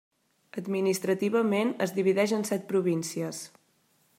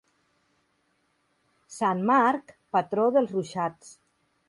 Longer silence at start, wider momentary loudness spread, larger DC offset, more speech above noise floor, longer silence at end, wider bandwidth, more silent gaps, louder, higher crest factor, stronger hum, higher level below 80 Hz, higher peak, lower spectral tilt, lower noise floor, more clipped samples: second, 0.55 s vs 1.7 s; about the same, 13 LU vs 11 LU; neither; second, 41 dB vs 47 dB; first, 0.7 s vs 0.55 s; first, 16 kHz vs 11.5 kHz; neither; about the same, -28 LUFS vs -26 LUFS; about the same, 16 dB vs 20 dB; neither; second, -80 dBFS vs -74 dBFS; about the same, -12 dBFS vs -10 dBFS; about the same, -5.5 dB/octave vs -6 dB/octave; about the same, -68 dBFS vs -71 dBFS; neither